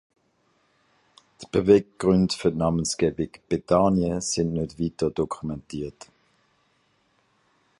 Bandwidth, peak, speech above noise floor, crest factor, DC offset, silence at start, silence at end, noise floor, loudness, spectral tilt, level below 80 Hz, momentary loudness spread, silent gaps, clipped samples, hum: 11.5 kHz; -4 dBFS; 44 dB; 22 dB; under 0.1%; 1.4 s; 1.9 s; -67 dBFS; -24 LUFS; -6 dB/octave; -48 dBFS; 13 LU; none; under 0.1%; none